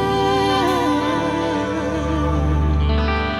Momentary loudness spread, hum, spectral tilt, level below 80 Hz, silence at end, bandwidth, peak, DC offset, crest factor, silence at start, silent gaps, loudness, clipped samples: 4 LU; none; -6.5 dB/octave; -24 dBFS; 0 s; 12 kHz; -8 dBFS; under 0.1%; 12 dB; 0 s; none; -19 LUFS; under 0.1%